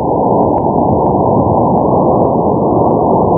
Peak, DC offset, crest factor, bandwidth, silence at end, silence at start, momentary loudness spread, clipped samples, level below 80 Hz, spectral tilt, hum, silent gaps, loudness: 0 dBFS; under 0.1%; 10 dB; 2.1 kHz; 0 s; 0 s; 1 LU; under 0.1%; -32 dBFS; -17 dB/octave; none; none; -11 LUFS